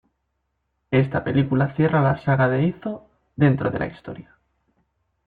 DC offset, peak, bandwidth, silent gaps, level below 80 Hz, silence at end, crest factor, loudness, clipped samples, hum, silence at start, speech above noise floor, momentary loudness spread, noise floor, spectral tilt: under 0.1%; -6 dBFS; 4.6 kHz; none; -52 dBFS; 1.05 s; 16 dB; -21 LUFS; under 0.1%; none; 0.9 s; 54 dB; 19 LU; -74 dBFS; -11 dB/octave